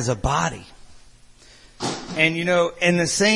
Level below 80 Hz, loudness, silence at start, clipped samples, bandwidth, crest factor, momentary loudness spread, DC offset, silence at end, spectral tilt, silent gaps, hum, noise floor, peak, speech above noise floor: -40 dBFS; -21 LUFS; 0 s; under 0.1%; 11.5 kHz; 20 dB; 11 LU; under 0.1%; 0 s; -4 dB/octave; none; none; -49 dBFS; -2 dBFS; 28 dB